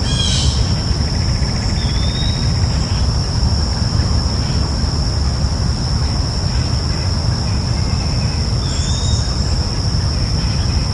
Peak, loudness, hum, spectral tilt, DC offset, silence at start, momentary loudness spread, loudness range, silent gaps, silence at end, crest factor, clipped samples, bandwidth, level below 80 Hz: -4 dBFS; -17 LUFS; none; -5 dB/octave; under 0.1%; 0 s; 2 LU; 1 LU; none; 0 s; 12 dB; under 0.1%; 11.5 kHz; -20 dBFS